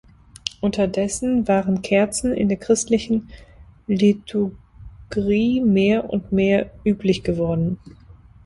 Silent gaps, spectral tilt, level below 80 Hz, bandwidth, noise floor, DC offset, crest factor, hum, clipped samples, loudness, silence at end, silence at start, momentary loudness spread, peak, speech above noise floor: none; -5.5 dB/octave; -44 dBFS; 11.5 kHz; -42 dBFS; under 0.1%; 20 dB; none; under 0.1%; -21 LUFS; 0.55 s; 0.45 s; 8 LU; 0 dBFS; 22 dB